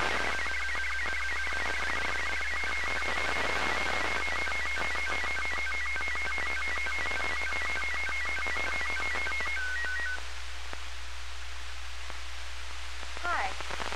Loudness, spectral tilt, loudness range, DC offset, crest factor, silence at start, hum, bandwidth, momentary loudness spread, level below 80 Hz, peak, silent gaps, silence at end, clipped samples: -31 LUFS; -2 dB/octave; 8 LU; 2%; 18 dB; 0 s; none; 15 kHz; 11 LU; -44 dBFS; -14 dBFS; none; 0 s; under 0.1%